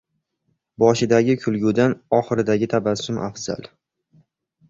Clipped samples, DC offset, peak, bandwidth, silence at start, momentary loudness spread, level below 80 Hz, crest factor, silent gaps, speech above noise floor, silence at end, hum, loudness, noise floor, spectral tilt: under 0.1%; under 0.1%; -2 dBFS; 7.8 kHz; 0.8 s; 10 LU; -56 dBFS; 20 dB; none; 52 dB; 1.05 s; none; -20 LUFS; -72 dBFS; -6 dB/octave